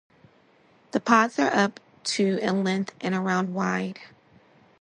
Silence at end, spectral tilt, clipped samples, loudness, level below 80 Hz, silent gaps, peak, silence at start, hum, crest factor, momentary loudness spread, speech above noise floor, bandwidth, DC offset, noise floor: 0.75 s; -5 dB/octave; under 0.1%; -25 LUFS; -72 dBFS; none; -4 dBFS; 0.95 s; none; 22 dB; 10 LU; 35 dB; 10.5 kHz; under 0.1%; -59 dBFS